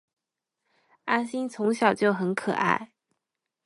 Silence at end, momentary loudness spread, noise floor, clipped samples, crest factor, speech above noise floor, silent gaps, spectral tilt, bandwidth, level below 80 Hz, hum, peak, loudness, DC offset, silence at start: 0.8 s; 7 LU; -85 dBFS; under 0.1%; 20 dB; 59 dB; none; -5.5 dB/octave; 11.5 kHz; -72 dBFS; none; -8 dBFS; -26 LUFS; under 0.1%; 1.05 s